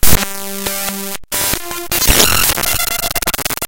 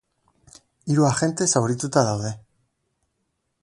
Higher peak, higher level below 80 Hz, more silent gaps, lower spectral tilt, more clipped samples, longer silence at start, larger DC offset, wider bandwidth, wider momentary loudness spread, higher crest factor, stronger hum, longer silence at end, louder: first, 0 dBFS vs -4 dBFS; first, -26 dBFS vs -58 dBFS; neither; second, -1.5 dB/octave vs -5 dB/octave; first, 0.3% vs under 0.1%; second, 0 s vs 0.85 s; neither; first, over 20 kHz vs 11.5 kHz; about the same, 11 LU vs 13 LU; second, 14 dB vs 22 dB; neither; second, 0 s vs 1.25 s; first, -14 LUFS vs -22 LUFS